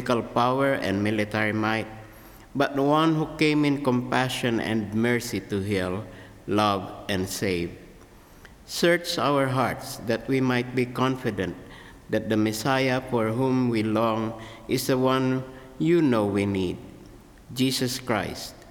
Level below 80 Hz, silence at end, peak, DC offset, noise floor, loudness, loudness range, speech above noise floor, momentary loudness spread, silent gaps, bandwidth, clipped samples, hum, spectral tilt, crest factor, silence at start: -54 dBFS; 0 s; -8 dBFS; under 0.1%; -49 dBFS; -25 LUFS; 3 LU; 25 dB; 11 LU; none; 19.5 kHz; under 0.1%; none; -5.5 dB/octave; 18 dB; 0 s